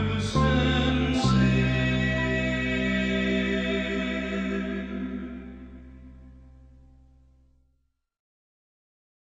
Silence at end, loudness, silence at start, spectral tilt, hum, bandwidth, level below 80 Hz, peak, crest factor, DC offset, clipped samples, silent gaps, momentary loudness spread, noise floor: 2.8 s; -25 LUFS; 0 s; -6 dB/octave; none; 9.2 kHz; -38 dBFS; -10 dBFS; 18 dB; under 0.1%; under 0.1%; none; 15 LU; -73 dBFS